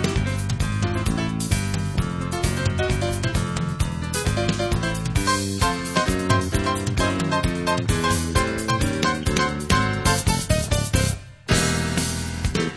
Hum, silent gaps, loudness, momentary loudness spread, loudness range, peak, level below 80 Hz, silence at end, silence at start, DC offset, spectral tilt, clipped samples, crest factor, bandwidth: none; none; -23 LUFS; 4 LU; 3 LU; -4 dBFS; -32 dBFS; 0 s; 0 s; 0.1%; -4.5 dB/octave; under 0.1%; 18 dB; 11 kHz